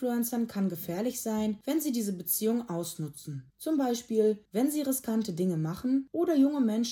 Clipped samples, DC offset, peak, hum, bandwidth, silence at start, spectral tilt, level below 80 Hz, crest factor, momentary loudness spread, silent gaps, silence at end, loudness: under 0.1%; under 0.1%; -14 dBFS; none; 18 kHz; 0 s; -5.5 dB/octave; -70 dBFS; 16 dB; 9 LU; none; 0 s; -30 LUFS